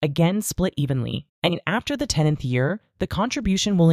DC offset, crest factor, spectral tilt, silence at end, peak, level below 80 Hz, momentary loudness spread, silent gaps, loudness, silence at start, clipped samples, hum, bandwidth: under 0.1%; 18 dB; -5.5 dB/octave; 0 s; -4 dBFS; -42 dBFS; 5 LU; 1.29-1.42 s; -23 LUFS; 0 s; under 0.1%; none; 15.5 kHz